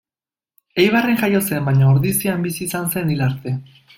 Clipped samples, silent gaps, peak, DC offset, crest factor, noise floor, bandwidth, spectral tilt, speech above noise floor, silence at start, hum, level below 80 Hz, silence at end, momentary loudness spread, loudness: under 0.1%; none; -2 dBFS; under 0.1%; 16 dB; under -90 dBFS; 17 kHz; -5.5 dB/octave; over 72 dB; 0.75 s; none; -50 dBFS; 0.35 s; 11 LU; -18 LUFS